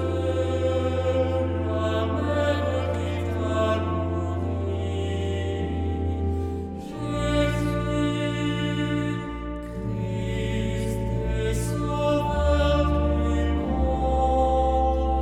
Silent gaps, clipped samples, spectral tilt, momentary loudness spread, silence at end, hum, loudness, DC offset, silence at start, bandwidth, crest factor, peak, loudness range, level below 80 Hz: none; under 0.1%; -7 dB/octave; 7 LU; 0 s; none; -25 LUFS; under 0.1%; 0 s; 12.5 kHz; 14 dB; -10 dBFS; 4 LU; -32 dBFS